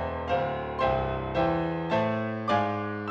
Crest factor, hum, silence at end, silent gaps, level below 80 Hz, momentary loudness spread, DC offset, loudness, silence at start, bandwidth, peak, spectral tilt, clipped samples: 16 dB; none; 0 s; none; -46 dBFS; 3 LU; under 0.1%; -28 LUFS; 0 s; 7.8 kHz; -12 dBFS; -7.5 dB/octave; under 0.1%